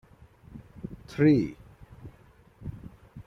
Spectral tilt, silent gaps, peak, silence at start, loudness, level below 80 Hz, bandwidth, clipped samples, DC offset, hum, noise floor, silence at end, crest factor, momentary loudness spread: -9 dB/octave; none; -10 dBFS; 0.55 s; -25 LUFS; -54 dBFS; 6.6 kHz; under 0.1%; under 0.1%; none; -57 dBFS; 0.05 s; 20 dB; 27 LU